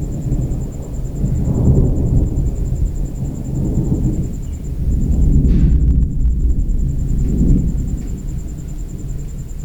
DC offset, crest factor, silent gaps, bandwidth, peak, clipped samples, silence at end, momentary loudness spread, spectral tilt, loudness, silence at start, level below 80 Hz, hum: under 0.1%; 14 dB; none; 8.2 kHz; 0 dBFS; under 0.1%; 0 s; 13 LU; -9.5 dB/octave; -19 LUFS; 0 s; -18 dBFS; none